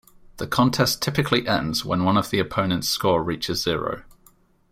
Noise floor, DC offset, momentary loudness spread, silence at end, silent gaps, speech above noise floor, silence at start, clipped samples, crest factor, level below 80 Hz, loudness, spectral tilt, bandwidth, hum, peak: -57 dBFS; under 0.1%; 6 LU; 0.7 s; none; 35 dB; 0.35 s; under 0.1%; 20 dB; -48 dBFS; -22 LUFS; -4.5 dB/octave; 16 kHz; none; -4 dBFS